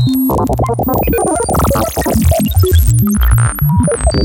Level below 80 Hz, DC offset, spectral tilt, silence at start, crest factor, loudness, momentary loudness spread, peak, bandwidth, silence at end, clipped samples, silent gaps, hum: -18 dBFS; under 0.1%; -6 dB/octave; 0 s; 12 dB; -12 LUFS; 3 LU; 0 dBFS; 17.5 kHz; 0 s; under 0.1%; none; none